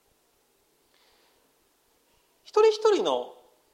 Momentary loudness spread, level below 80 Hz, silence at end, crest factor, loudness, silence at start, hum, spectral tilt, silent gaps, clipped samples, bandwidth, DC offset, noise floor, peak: 11 LU; -80 dBFS; 0.45 s; 20 dB; -24 LUFS; 2.55 s; none; -2.5 dB/octave; none; under 0.1%; 9.6 kHz; under 0.1%; -68 dBFS; -10 dBFS